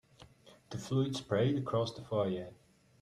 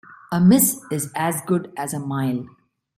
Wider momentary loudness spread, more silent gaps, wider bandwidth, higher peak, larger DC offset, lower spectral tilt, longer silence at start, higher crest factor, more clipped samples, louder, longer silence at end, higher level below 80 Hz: about the same, 14 LU vs 13 LU; neither; second, 13 kHz vs 16 kHz; second, -18 dBFS vs -4 dBFS; neither; about the same, -6.5 dB/octave vs -5.5 dB/octave; about the same, 0.2 s vs 0.1 s; about the same, 18 dB vs 18 dB; neither; second, -35 LUFS vs -21 LUFS; about the same, 0.5 s vs 0.5 s; second, -68 dBFS vs -60 dBFS